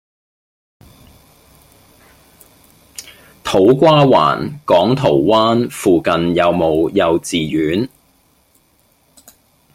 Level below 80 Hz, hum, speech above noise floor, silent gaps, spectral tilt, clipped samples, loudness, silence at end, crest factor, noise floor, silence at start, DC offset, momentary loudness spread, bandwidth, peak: -48 dBFS; none; 44 dB; none; -6 dB/octave; under 0.1%; -14 LUFS; 1.85 s; 16 dB; -57 dBFS; 3 s; under 0.1%; 16 LU; 16 kHz; -2 dBFS